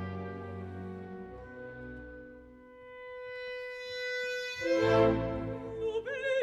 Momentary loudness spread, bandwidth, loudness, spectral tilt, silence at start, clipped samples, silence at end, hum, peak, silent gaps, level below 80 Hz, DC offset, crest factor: 21 LU; 12.5 kHz; -33 LUFS; -6 dB/octave; 0 s; under 0.1%; 0 s; none; -14 dBFS; none; -54 dBFS; under 0.1%; 20 dB